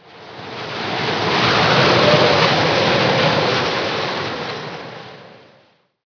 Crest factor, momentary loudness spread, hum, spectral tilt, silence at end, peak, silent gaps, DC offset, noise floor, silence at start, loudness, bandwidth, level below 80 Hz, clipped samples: 18 dB; 19 LU; none; -4.5 dB/octave; 0.75 s; 0 dBFS; none; under 0.1%; -55 dBFS; 0.15 s; -16 LUFS; 5.4 kHz; -50 dBFS; under 0.1%